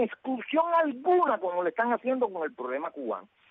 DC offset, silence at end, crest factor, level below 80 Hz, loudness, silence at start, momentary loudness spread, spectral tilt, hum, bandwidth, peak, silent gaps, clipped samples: under 0.1%; 0.25 s; 14 dB; -82 dBFS; -28 LUFS; 0 s; 10 LU; -7.5 dB/octave; none; 4.1 kHz; -14 dBFS; none; under 0.1%